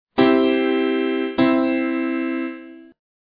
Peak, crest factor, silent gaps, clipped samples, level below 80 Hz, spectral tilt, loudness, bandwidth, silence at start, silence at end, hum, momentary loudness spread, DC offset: -2 dBFS; 18 dB; none; under 0.1%; -58 dBFS; -8 dB/octave; -19 LUFS; 5 kHz; 0.2 s; 0.55 s; none; 10 LU; under 0.1%